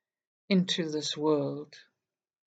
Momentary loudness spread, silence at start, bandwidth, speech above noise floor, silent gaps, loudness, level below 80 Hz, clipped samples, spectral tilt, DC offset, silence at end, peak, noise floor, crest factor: 13 LU; 0.5 s; 9 kHz; 60 dB; none; -29 LUFS; -86 dBFS; under 0.1%; -5 dB/octave; under 0.1%; 0.7 s; -12 dBFS; -89 dBFS; 20 dB